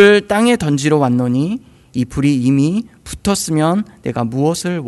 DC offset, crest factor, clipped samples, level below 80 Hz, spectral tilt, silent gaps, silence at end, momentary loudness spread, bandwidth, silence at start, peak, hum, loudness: under 0.1%; 14 dB; 0.2%; -42 dBFS; -5.5 dB/octave; none; 0 s; 9 LU; 12.5 kHz; 0 s; 0 dBFS; none; -16 LUFS